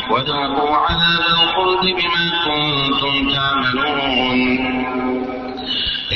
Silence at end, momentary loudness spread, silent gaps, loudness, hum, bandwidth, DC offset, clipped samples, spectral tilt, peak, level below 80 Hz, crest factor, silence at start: 0 s; 7 LU; none; -16 LUFS; none; 6.2 kHz; under 0.1%; under 0.1%; -1.5 dB/octave; -4 dBFS; -40 dBFS; 14 dB; 0 s